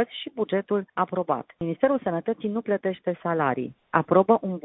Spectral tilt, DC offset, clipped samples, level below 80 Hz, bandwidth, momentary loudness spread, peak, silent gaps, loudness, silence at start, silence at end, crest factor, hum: -11 dB/octave; under 0.1%; under 0.1%; -66 dBFS; 4 kHz; 9 LU; -4 dBFS; none; -26 LUFS; 0 s; 0.05 s; 22 dB; none